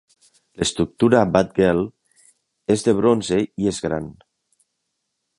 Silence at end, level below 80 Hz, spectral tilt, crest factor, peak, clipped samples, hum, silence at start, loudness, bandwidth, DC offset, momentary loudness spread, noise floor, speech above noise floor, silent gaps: 1.25 s; -48 dBFS; -5.5 dB/octave; 20 dB; -2 dBFS; under 0.1%; none; 0.6 s; -20 LUFS; 11.5 kHz; under 0.1%; 11 LU; -76 dBFS; 57 dB; none